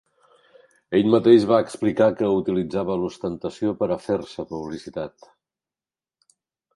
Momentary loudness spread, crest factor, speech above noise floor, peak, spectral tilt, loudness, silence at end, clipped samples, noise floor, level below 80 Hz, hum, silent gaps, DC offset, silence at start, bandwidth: 17 LU; 20 dB; over 69 dB; -4 dBFS; -7 dB/octave; -22 LUFS; 1.65 s; under 0.1%; under -90 dBFS; -56 dBFS; none; none; under 0.1%; 0.9 s; 11.5 kHz